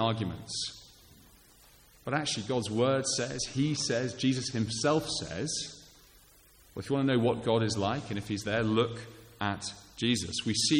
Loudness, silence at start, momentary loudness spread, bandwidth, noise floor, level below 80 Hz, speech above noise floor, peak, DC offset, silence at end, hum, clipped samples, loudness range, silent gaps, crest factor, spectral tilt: -31 LUFS; 0 s; 11 LU; 17 kHz; -59 dBFS; -60 dBFS; 29 dB; -12 dBFS; under 0.1%; 0 s; none; under 0.1%; 3 LU; none; 18 dB; -4.5 dB/octave